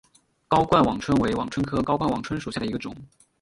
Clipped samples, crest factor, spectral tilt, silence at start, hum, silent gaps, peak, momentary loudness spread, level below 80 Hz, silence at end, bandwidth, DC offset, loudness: under 0.1%; 20 dB; -6.5 dB/octave; 0.5 s; none; none; -4 dBFS; 11 LU; -48 dBFS; 0.35 s; 11.5 kHz; under 0.1%; -24 LUFS